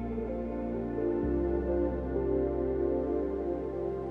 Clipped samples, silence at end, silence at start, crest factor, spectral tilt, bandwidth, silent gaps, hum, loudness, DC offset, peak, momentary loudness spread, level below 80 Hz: under 0.1%; 0 s; 0 s; 12 dB; -11 dB/octave; 4.2 kHz; none; none; -32 LUFS; under 0.1%; -18 dBFS; 5 LU; -42 dBFS